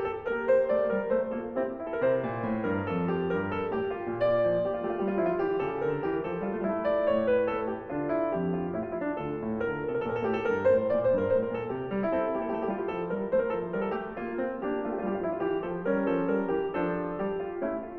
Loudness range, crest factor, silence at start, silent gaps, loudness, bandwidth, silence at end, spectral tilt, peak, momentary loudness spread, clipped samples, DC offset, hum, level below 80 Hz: 3 LU; 14 dB; 0 s; none; -29 LUFS; 5.8 kHz; 0 s; -6.5 dB/octave; -14 dBFS; 7 LU; under 0.1%; under 0.1%; none; -58 dBFS